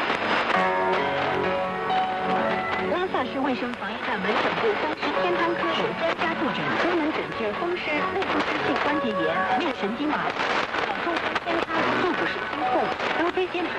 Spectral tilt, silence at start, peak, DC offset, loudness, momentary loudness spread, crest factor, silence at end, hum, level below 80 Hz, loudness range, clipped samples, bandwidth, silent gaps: -5 dB/octave; 0 s; -8 dBFS; under 0.1%; -25 LUFS; 4 LU; 18 dB; 0 s; none; -58 dBFS; 1 LU; under 0.1%; 11 kHz; none